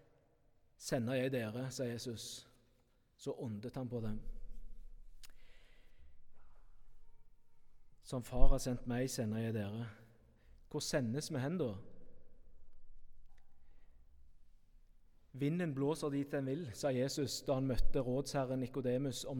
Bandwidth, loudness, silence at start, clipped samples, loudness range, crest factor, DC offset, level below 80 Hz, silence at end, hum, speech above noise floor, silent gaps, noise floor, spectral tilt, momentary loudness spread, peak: 15 kHz; -40 LUFS; 0.8 s; under 0.1%; 11 LU; 26 dB; under 0.1%; -44 dBFS; 0 s; none; 37 dB; none; -72 dBFS; -5.5 dB/octave; 12 LU; -12 dBFS